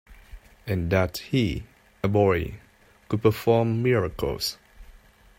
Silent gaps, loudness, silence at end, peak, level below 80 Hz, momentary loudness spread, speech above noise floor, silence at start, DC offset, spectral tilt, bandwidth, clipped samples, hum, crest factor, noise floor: none; -25 LUFS; 0.45 s; -6 dBFS; -46 dBFS; 11 LU; 28 dB; 0.1 s; under 0.1%; -6.5 dB/octave; 16.5 kHz; under 0.1%; none; 20 dB; -52 dBFS